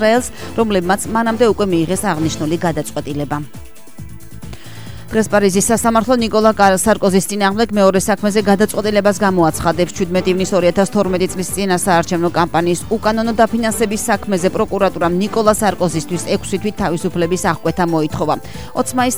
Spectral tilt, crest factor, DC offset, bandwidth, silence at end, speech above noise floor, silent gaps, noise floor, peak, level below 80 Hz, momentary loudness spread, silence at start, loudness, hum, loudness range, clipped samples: -5 dB/octave; 16 dB; 2%; over 20 kHz; 0 s; 20 dB; none; -35 dBFS; 0 dBFS; -40 dBFS; 9 LU; 0 s; -16 LUFS; none; 5 LU; under 0.1%